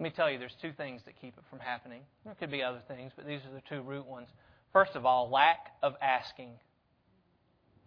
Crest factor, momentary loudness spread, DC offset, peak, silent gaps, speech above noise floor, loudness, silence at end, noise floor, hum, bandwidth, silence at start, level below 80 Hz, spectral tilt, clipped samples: 24 dB; 24 LU; under 0.1%; -10 dBFS; none; 38 dB; -32 LUFS; 1.3 s; -71 dBFS; none; 5.4 kHz; 0 s; -74 dBFS; -6.5 dB/octave; under 0.1%